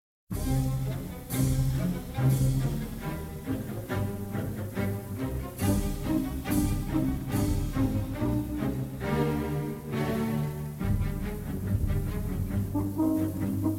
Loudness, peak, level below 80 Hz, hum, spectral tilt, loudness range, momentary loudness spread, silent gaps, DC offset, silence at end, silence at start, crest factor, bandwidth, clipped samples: -30 LUFS; -12 dBFS; -38 dBFS; none; -7 dB/octave; 2 LU; 7 LU; none; under 0.1%; 0 s; 0.3 s; 16 dB; 17 kHz; under 0.1%